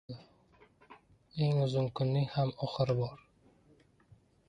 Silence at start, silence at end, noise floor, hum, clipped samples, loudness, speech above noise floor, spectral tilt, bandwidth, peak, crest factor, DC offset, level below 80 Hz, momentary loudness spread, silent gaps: 0.1 s; 1.35 s; -65 dBFS; none; under 0.1%; -33 LUFS; 34 dB; -8.5 dB/octave; 7.6 kHz; -18 dBFS; 16 dB; under 0.1%; -64 dBFS; 14 LU; none